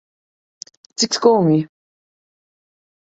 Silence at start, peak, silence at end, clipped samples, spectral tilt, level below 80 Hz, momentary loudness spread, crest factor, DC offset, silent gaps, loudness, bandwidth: 1 s; -2 dBFS; 1.5 s; under 0.1%; -5 dB/octave; -66 dBFS; 23 LU; 20 dB; under 0.1%; none; -16 LUFS; 8.2 kHz